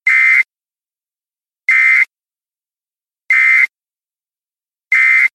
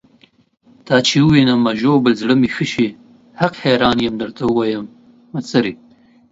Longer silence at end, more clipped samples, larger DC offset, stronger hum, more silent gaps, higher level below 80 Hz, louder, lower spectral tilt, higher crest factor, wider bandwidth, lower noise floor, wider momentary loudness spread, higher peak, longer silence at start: second, 0.05 s vs 0.55 s; neither; neither; neither; neither; second, under -90 dBFS vs -50 dBFS; first, -10 LUFS vs -16 LUFS; second, 4.5 dB/octave vs -5.5 dB/octave; about the same, 14 dB vs 16 dB; first, 13.5 kHz vs 7.8 kHz; first, under -90 dBFS vs -53 dBFS; about the same, 9 LU vs 10 LU; about the same, 0 dBFS vs 0 dBFS; second, 0.05 s vs 0.85 s